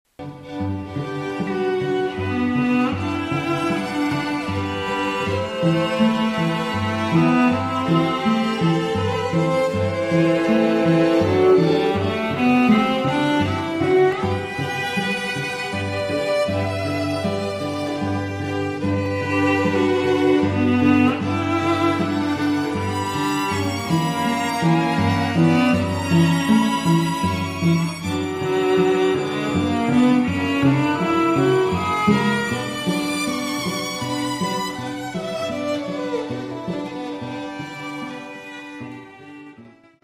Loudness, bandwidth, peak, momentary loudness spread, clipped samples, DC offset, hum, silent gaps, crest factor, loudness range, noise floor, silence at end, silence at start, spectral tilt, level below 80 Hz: -20 LUFS; 15.5 kHz; -4 dBFS; 11 LU; under 0.1%; under 0.1%; none; none; 16 dB; 7 LU; -47 dBFS; 0.35 s; 0.2 s; -6 dB/octave; -52 dBFS